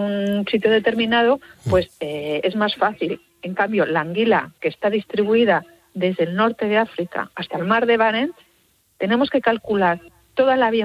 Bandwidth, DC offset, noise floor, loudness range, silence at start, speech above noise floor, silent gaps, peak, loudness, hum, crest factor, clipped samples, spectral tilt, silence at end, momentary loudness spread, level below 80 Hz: 13.5 kHz; under 0.1%; -61 dBFS; 1 LU; 0 s; 41 dB; none; -4 dBFS; -20 LUFS; none; 16 dB; under 0.1%; -6.5 dB/octave; 0 s; 10 LU; -50 dBFS